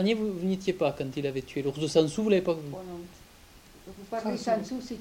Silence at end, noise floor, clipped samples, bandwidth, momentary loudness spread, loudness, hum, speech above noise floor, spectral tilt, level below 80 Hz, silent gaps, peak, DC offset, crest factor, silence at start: 0 s; -53 dBFS; under 0.1%; 17 kHz; 17 LU; -29 LUFS; none; 24 dB; -6 dB/octave; -58 dBFS; none; -10 dBFS; under 0.1%; 20 dB; 0 s